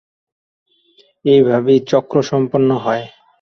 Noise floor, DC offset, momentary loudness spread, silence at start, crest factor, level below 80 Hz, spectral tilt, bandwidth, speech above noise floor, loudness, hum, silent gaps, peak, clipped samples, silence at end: -54 dBFS; under 0.1%; 10 LU; 1.25 s; 14 dB; -60 dBFS; -7 dB/octave; 6.6 kHz; 41 dB; -15 LUFS; none; none; -2 dBFS; under 0.1%; 0.35 s